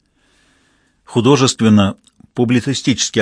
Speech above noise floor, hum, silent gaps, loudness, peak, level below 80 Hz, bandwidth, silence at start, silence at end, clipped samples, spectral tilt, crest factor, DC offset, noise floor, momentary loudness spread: 44 dB; 50 Hz at -40 dBFS; none; -14 LUFS; 0 dBFS; -54 dBFS; 10.5 kHz; 1.1 s; 0 s; under 0.1%; -5 dB/octave; 16 dB; under 0.1%; -58 dBFS; 8 LU